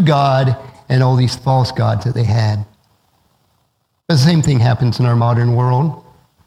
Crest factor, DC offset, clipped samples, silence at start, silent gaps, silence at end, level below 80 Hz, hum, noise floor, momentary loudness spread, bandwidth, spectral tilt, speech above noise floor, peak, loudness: 14 dB; under 0.1%; under 0.1%; 0 s; none; 0.45 s; -46 dBFS; none; -65 dBFS; 7 LU; 11.5 kHz; -7 dB/octave; 51 dB; 0 dBFS; -15 LUFS